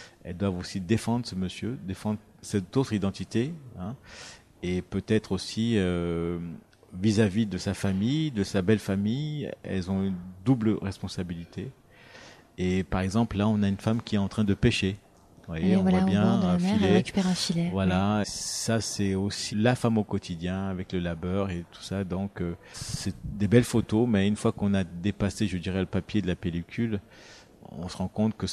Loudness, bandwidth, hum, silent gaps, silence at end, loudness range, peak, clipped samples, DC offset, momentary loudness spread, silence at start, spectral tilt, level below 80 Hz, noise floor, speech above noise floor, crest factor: -28 LUFS; 13.5 kHz; none; none; 0 s; 6 LU; -6 dBFS; under 0.1%; under 0.1%; 13 LU; 0 s; -6 dB/octave; -50 dBFS; -50 dBFS; 23 dB; 22 dB